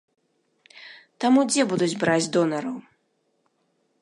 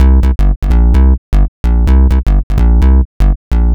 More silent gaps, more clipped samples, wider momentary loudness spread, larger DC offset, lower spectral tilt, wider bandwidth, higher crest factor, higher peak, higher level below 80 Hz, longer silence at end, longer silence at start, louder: second, none vs 0.56-0.62 s, 1.18-1.32 s, 1.48-1.64 s, 2.43-2.50 s, 3.05-3.20 s, 3.36-3.51 s; neither; first, 19 LU vs 5 LU; neither; second, -4.5 dB/octave vs -9 dB/octave; first, 11.5 kHz vs 4.4 kHz; first, 18 dB vs 8 dB; second, -8 dBFS vs 0 dBFS; second, -72 dBFS vs -8 dBFS; first, 1.2 s vs 0 s; first, 0.75 s vs 0 s; second, -22 LUFS vs -12 LUFS